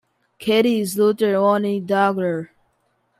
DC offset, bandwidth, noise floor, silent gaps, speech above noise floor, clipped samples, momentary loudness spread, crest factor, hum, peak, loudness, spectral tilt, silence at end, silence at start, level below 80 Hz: under 0.1%; 16 kHz; -67 dBFS; none; 48 dB; under 0.1%; 10 LU; 16 dB; none; -4 dBFS; -19 LUFS; -5.5 dB/octave; 0.75 s; 0.4 s; -68 dBFS